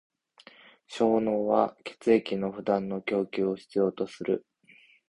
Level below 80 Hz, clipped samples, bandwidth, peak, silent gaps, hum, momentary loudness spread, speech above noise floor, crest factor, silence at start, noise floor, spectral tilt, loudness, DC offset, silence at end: -66 dBFS; under 0.1%; 11 kHz; -8 dBFS; none; none; 7 LU; 32 dB; 22 dB; 0.9 s; -59 dBFS; -7 dB/octave; -28 LUFS; under 0.1%; 0.7 s